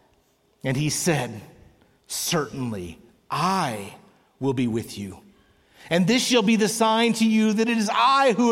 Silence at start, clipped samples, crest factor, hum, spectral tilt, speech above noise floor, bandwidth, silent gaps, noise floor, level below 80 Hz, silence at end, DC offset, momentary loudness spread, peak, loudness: 0.65 s; under 0.1%; 16 dB; none; -4.5 dB/octave; 42 dB; 16.5 kHz; none; -64 dBFS; -60 dBFS; 0 s; under 0.1%; 16 LU; -8 dBFS; -22 LUFS